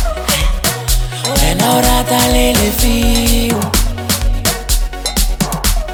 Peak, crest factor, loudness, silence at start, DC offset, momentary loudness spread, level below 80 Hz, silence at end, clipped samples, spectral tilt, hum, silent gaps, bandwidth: 0 dBFS; 12 dB; -14 LUFS; 0 s; under 0.1%; 6 LU; -16 dBFS; 0 s; under 0.1%; -3.5 dB/octave; none; none; over 20 kHz